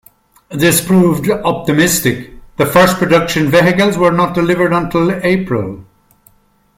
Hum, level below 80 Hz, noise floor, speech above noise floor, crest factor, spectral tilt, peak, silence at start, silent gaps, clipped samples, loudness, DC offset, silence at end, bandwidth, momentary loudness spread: none; -42 dBFS; -53 dBFS; 41 dB; 14 dB; -5 dB/octave; 0 dBFS; 0.5 s; none; under 0.1%; -12 LUFS; under 0.1%; 0.95 s; 16.5 kHz; 9 LU